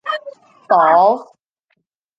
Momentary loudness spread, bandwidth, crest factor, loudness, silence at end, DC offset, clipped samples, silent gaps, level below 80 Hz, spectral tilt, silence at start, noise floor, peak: 14 LU; 7.4 kHz; 16 dB; -14 LUFS; 0.95 s; under 0.1%; under 0.1%; none; -74 dBFS; -6 dB/octave; 0.05 s; -69 dBFS; -2 dBFS